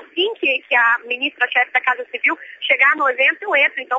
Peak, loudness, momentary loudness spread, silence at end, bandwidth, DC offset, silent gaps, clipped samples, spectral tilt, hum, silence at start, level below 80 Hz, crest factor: -2 dBFS; -16 LUFS; 6 LU; 0 s; 7.8 kHz; under 0.1%; none; under 0.1%; -2 dB/octave; none; 0 s; -80 dBFS; 16 dB